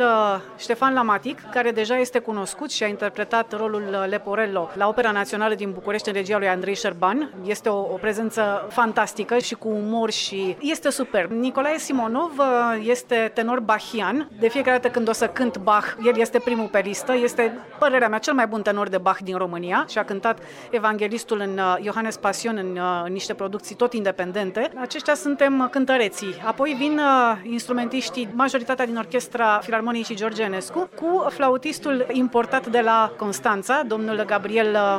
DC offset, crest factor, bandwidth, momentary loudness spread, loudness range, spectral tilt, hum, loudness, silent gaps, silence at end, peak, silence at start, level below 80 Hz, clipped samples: under 0.1%; 16 dB; 16 kHz; 7 LU; 3 LU; -4 dB/octave; none; -22 LUFS; none; 0 s; -6 dBFS; 0 s; -66 dBFS; under 0.1%